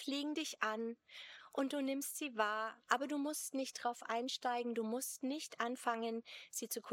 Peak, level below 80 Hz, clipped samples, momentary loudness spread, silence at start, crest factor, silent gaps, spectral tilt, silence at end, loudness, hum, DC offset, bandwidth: -16 dBFS; under -90 dBFS; under 0.1%; 8 LU; 0 s; 24 dB; none; -2 dB/octave; 0 s; -40 LUFS; none; under 0.1%; 18 kHz